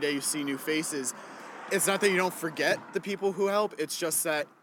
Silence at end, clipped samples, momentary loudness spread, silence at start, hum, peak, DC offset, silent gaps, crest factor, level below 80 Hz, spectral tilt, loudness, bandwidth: 0.15 s; under 0.1%; 9 LU; 0 s; none; -8 dBFS; under 0.1%; none; 20 dB; -78 dBFS; -2.5 dB/octave; -29 LUFS; 19.5 kHz